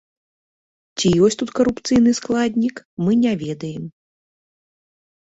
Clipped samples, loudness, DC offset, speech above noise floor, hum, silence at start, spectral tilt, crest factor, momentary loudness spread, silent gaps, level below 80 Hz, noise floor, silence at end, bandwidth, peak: under 0.1%; -19 LUFS; under 0.1%; over 72 dB; none; 0.95 s; -5.5 dB/octave; 16 dB; 14 LU; 2.85-2.97 s; -50 dBFS; under -90 dBFS; 1.3 s; 8 kHz; -4 dBFS